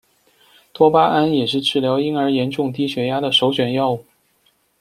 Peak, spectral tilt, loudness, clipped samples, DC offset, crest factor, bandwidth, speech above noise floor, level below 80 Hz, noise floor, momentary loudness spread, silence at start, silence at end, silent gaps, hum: 0 dBFS; -6 dB/octave; -18 LUFS; under 0.1%; under 0.1%; 18 dB; 15 kHz; 44 dB; -58 dBFS; -62 dBFS; 7 LU; 0.8 s; 0.8 s; none; none